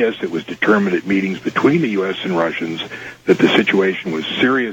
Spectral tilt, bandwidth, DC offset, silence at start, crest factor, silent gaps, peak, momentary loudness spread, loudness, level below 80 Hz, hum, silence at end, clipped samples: -6 dB/octave; 17 kHz; under 0.1%; 0 s; 14 dB; none; -2 dBFS; 11 LU; -17 LUFS; -58 dBFS; none; 0 s; under 0.1%